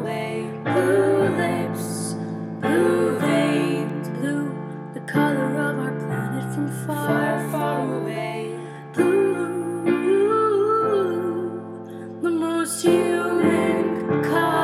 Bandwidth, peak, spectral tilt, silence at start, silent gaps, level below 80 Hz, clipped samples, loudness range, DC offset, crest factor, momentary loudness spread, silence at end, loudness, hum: 15.5 kHz; -6 dBFS; -6 dB/octave; 0 s; none; -70 dBFS; under 0.1%; 3 LU; under 0.1%; 16 dB; 10 LU; 0 s; -22 LUFS; none